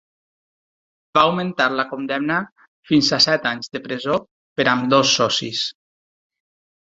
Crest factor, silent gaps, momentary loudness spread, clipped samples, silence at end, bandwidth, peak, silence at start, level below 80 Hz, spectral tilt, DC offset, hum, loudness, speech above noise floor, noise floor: 20 dB; 2.52-2.56 s, 2.68-2.83 s, 4.31-4.56 s; 11 LU; under 0.1%; 1.15 s; 7.8 kHz; -2 dBFS; 1.15 s; -60 dBFS; -3.5 dB/octave; under 0.1%; none; -19 LUFS; over 71 dB; under -90 dBFS